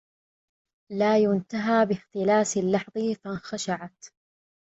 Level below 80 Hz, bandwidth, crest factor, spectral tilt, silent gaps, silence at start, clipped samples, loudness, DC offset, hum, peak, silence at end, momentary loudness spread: -68 dBFS; 8.2 kHz; 18 dB; -5 dB/octave; none; 0.9 s; under 0.1%; -25 LUFS; under 0.1%; none; -10 dBFS; 0.7 s; 11 LU